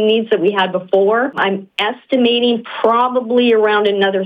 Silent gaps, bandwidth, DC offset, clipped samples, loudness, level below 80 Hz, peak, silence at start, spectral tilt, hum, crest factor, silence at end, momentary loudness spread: none; 5 kHz; under 0.1%; under 0.1%; -15 LUFS; -66 dBFS; -4 dBFS; 0 s; -6.5 dB/octave; none; 12 dB; 0 s; 5 LU